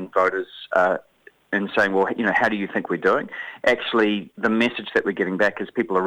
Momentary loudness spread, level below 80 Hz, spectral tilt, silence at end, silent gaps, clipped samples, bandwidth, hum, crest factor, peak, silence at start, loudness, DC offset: 6 LU; -62 dBFS; -5.5 dB/octave; 0 s; none; under 0.1%; 12 kHz; none; 18 dB; -4 dBFS; 0 s; -22 LUFS; under 0.1%